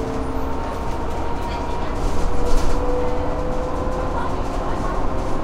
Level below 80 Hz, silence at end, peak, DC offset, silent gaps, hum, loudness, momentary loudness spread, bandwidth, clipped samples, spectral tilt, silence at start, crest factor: -24 dBFS; 0 s; -4 dBFS; under 0.1%; none; none; -25 LUFS; 3 LU; 10.5 kHz; under 0.1%; -6.5 dB/octave; 0 s; 16 dB